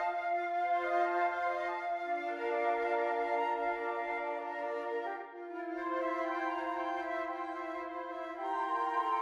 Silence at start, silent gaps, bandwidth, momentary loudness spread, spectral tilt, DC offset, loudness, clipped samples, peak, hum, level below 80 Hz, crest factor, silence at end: 0 s; none; 11 kHz; 8 LU; -3.5 dB/octave; under 0.1%; -35 LUFS; under 0.1%; -20 dBFS; none; -74 dBFS; 14 dB; 0 s